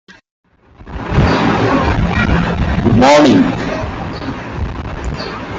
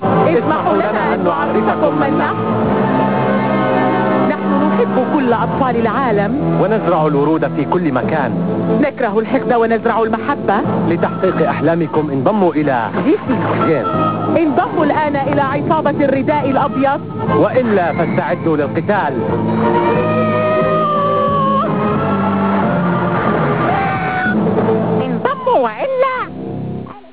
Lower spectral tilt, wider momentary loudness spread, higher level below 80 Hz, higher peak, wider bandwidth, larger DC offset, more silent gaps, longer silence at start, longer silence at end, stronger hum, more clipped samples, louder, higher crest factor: second, -6.5 dB/octave vs -11.5 dB/octave; first, 15 LU vs 3 LU; first, -26 dBFS vs -44 dBFS; about the same, 0 dBFS vs 0 dBFS; first, 9 kHz vs 4 kHz; second, under 0.1% vs 0.8%; first, 0.31-0.43 s vs none; about the same, 0.1 s vs 0 s; about the same, 0 s vs 0.1 s; neither; neither; about the same, -14 LUFS vs -15 LUFS; about the same, 14 dB vs 14 dB